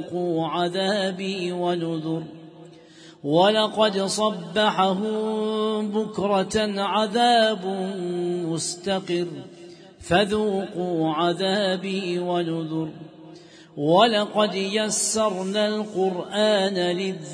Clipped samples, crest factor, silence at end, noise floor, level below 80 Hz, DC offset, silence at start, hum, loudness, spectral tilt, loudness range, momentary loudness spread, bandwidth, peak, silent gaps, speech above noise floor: under 0.1%; 18 dB; 0 s; -47 dBFS; -60 dBFS; under 0.1%; 0 s; none; -23 LUFS; -4 dB/octave; 4 LU; 9 LU; 11 kHz; -4 dBFS; none; 24 dB